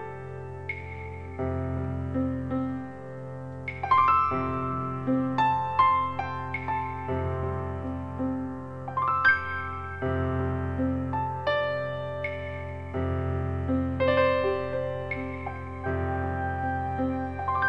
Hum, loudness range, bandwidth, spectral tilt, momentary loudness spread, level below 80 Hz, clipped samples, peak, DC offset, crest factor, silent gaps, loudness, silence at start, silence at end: none; 5 LU; 6.8 kHz; -8.5 dB/octave; 13 LU; -46 dBFS; under 0.1%; -10 dBFS; 0.3%; 18 dB; none; -28 LUFS; 0 s; 0 s